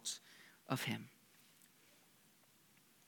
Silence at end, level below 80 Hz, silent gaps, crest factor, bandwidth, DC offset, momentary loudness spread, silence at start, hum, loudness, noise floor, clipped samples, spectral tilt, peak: 1.65 s; under -90 dBFS; none; 28 dB; 19 kHz; under 0.1%; 26 LU; 0 s; none; -44 LUFS; -70 dBFS; under 0.1%; -3.5 dB/octave; -22 dBFS